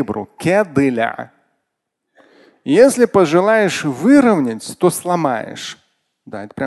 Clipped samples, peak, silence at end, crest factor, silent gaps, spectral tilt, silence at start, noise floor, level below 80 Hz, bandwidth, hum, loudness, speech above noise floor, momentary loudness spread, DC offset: under 0.1%; 0 dBFS; 0 s; 16 dB; none; -5.5 dB/octave; 0 s; -76 dBFS; -54 dBFS; 12.5 kHz; none; -15 LUFS; 61 dB; 20 LU; under 0.1%